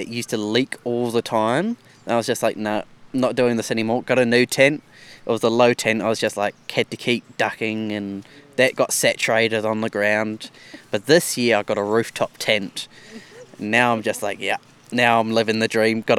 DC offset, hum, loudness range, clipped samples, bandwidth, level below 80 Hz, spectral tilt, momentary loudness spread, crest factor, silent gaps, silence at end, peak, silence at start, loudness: under 0.1%; none; 3 LU; under 0.1%; 16.5 kHz; -64 dBFS; -4 dB/octave; 12 LU; 20 dB; none; 0 s; 0 dBFS; 0 s; -20 LUFS